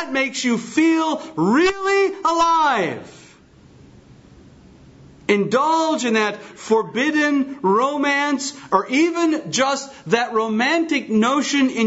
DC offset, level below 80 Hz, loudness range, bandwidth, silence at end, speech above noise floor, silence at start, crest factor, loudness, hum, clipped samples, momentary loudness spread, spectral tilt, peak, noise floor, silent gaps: under 0.1%; -58 dBFS; 4 LU; 8 kHz; 0 s; 29 dB; 0 s; 18 dB; -19 LUFS; none; under 0.1%; 5 LU; -4 dB/octave; -2 dBFS; -48 dBFS; none